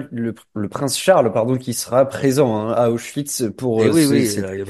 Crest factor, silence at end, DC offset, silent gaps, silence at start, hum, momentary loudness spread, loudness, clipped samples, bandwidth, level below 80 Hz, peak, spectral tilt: 16 dB; 0 s; under 0.1%; none; 0 s; none; 11 LU; -18 LUFS; under 0.1%; 13 kHz; -58 dBFS; -2 dBFS; -5 dB/octave